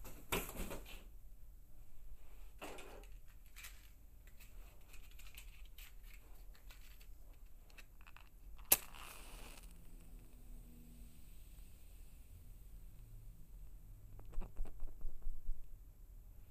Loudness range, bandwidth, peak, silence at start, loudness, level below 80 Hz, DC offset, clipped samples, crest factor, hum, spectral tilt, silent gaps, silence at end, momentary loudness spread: 18 LU; 15.5 kHz; -10 dBFS; 0 s; -44 LUFS; -52 dBFS; under 0.1%; under 0.1%; 36 dB; none; -2 dB/octave; none; 0 s; 15 LU